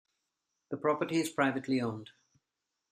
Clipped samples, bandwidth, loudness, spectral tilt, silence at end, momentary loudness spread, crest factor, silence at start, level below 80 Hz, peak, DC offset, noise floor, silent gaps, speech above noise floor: under 0.1%; 13.5 kHz; -32 LUFS; -5.5 dB/octave; 0.85 s; 11 LU; 22 dB; 0.7 s; -78 dBFS; -12 dBFS; under 0.1%; -87 dBFS; none; 55 dB